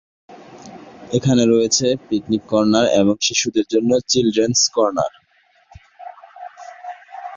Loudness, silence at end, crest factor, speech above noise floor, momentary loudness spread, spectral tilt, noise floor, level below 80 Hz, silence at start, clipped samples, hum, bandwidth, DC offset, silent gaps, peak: -17 LUFS; 0 s; 16 dB; 41 dB; 23 LU; -4 dB/octave; -58 dBFS; -54 dBFS; 0.3 s; under 0.1%; none; 7.8 kHz; under 0.1%; none; -2 dBFS